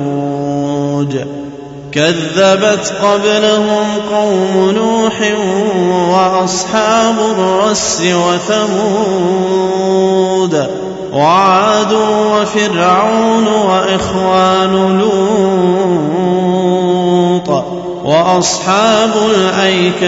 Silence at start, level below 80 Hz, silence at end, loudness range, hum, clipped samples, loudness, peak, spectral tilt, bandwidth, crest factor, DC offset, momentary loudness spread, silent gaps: 0 s; -46 dBFS; 0 s; 2 LU; none; under 0.1%; -11 LUFS; 0 dBFS; -4.5 dB/octave; 8 kHz; 10 dB; under 0.1%; 6 LU; none